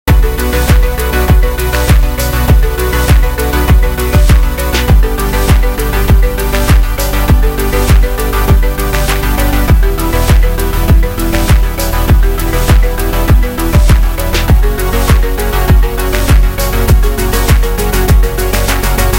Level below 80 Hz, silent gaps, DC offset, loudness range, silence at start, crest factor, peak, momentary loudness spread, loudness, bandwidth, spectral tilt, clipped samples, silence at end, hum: -10 dBFS; none; under 0.1%; 1 LU; 0.05 s; 8 dB; 0 dBFS; 3 LU; -11 LUFS; 17 kHz; -5.5 dB/octave; 0.2%; 0 s; none